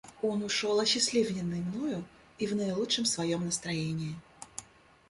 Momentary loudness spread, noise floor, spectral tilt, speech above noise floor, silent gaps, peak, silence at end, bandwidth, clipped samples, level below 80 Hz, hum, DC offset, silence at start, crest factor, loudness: 18 LU; -58 dBFS; -3.5 dB/octave; 27 dB; none; -14 dBFS; 0.45 s; 11.5 kHz; under 0.1%; -64 dBFS; none; under 0.1%; 0.05 s; 18 dB; -31 LUFS